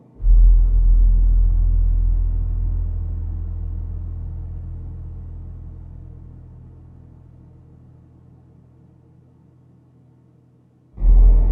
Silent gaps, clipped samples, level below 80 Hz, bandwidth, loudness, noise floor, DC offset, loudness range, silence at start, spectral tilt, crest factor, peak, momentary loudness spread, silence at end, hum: none; under 0.1%; -18 dBFS; 1.1 kHz; -21 LUFS; -54 dBFS; under 0.1%; 24 LU; 0.2 s; -12.5 dB/octave; 14 dB; -4 dBFS; 24 LU; 0 s; none